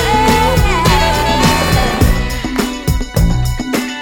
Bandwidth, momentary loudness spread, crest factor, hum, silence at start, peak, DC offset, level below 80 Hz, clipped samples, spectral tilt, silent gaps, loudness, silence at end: 19 kHz; 7 LU; 12 dB; none; 0 s; 0 dBFS; under 0.1%; -18 dBFS; under 0.1%; -5 dB/octave; none; -13 LUFS; 0 s